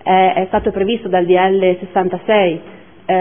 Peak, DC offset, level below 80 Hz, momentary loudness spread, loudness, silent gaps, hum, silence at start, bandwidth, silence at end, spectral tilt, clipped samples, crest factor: 0 dBFS; 0.6%; -44 dBFS; 6 LU; -15 LUFS; none; none; 0.05 s; 3.6 kHz; 0 s; -10 dB/octave; under 0.1%; 14 dB